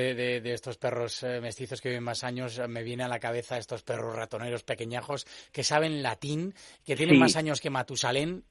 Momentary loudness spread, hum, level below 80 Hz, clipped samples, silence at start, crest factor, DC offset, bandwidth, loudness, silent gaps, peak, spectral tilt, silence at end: 12 LU; none; -66 dBFS; under 0.1%; 0 s; 24 dB; under 0.1%; 11.5 kHz; -30 LUFS; none; -6 dBFS; -4.5 dB/octave; 0.1 s